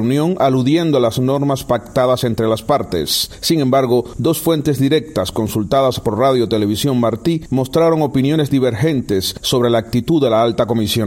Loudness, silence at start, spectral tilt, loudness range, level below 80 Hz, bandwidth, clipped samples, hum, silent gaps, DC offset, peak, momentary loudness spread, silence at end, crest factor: -16 LUFS; 0 s; -6 dB/octave; 1 LU; -42 dBFS; 16.5 kHz; under 0.1%; none; none; under 0.1%; -2 dBFS; 4 LU; 0 s; 12 dB